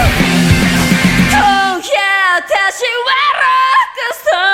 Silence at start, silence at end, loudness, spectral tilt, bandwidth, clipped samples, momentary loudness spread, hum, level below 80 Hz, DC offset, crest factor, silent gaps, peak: 0 s; 0 s; -11 LUFS; -4 dB/octave; 16.5 kHz; under 0.1%; 4 LU; none; -28 dBFS; under 0.1%; 12 dB; none; 0 dBFS